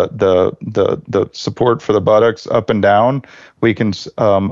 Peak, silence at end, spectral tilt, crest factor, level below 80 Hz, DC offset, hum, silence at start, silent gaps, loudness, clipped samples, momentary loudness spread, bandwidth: -2 dBFS; 0 s; -7 dB/octave; 12 dB; -42 dBFS; under 0.1%; none; 0 s; none; -15 LUFS; under 0.1%; 7 LU; 7.6 kHz